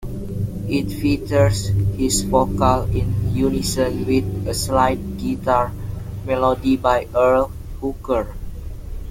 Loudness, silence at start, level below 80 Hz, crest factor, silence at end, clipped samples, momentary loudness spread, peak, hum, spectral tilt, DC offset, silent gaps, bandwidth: -20 LUFS; 0 s; -32 dBFS; 18 dB; 0 s; under 0.1%; 12 LU; -2 dBFS; none; -6 dB/octave; under 0.1%; none; 16.5 kHz